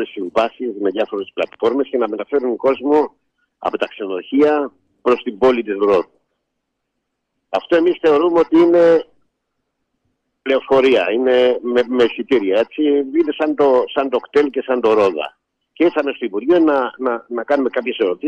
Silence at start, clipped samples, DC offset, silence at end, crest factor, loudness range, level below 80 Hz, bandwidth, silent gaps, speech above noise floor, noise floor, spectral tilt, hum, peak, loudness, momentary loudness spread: 0 s; under 0.1%; under 0.1%; 0 s; 12 dB; 3 LU; -58 dBFS; 7.8 kHz; none; 59 dB; -75 dBFS; -6 dB/octave; none; -4 dBFS; -17 LUFS; 9 LU